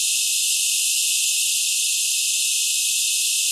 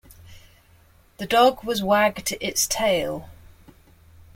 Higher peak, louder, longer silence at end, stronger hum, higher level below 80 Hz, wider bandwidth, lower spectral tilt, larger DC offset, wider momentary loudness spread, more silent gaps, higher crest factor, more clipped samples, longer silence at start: about the same, -8 dBFS vs -6 dBFS; first, -17 LUFS vs -21 LUFS; second, 0 s vs 1.05 s; neither; second, under -90 dBFS vs -52 dBFS; second, 12 kHz vs 16.5 kHz; second, 15.5 dB/octave vs -2.5 dB/octave; neither; second, 1 LU vs 12 LU; neither; about the same, 14 dB vs 18 dB; neither; second, 0 s vs 0.3 s